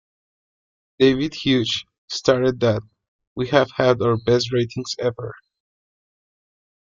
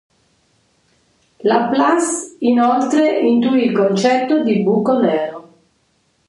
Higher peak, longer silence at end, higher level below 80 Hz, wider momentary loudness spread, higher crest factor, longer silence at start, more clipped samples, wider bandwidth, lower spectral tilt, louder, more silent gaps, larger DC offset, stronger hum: about the same, -2 dBFS vs -2 dBFS; first, 1.55 s vs 0.85 s; first, -54 dBFS vs -66 dBFS; first, 11 LU vs 6 LU; about the same, 20 dB vs 16 dB; second, 1 s vs 1.45 s; neither; second, 7.6 kHz vs 11.5 kHz; about the same, -5.5 dB/octave vs -5 dB/octave; second, -20 LUFS vs -15 LUFS; first, 1.98-2.08 s, 3.08-3.19 s, 3.27-3.36 s vs none; neither; neither